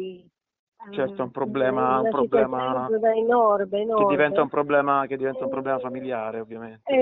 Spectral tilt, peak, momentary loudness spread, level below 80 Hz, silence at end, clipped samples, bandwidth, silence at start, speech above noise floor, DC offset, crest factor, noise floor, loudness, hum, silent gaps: -4.5 dB/octave; -6 dBFS; 10 LU; -62 dBFS; 0 s; under 0.1%; 4 kHz; 0 s; 25 dB; under 0.1%; 16 dB; -47 dBFS; -23 LUFS; none; 0.59-0.72 s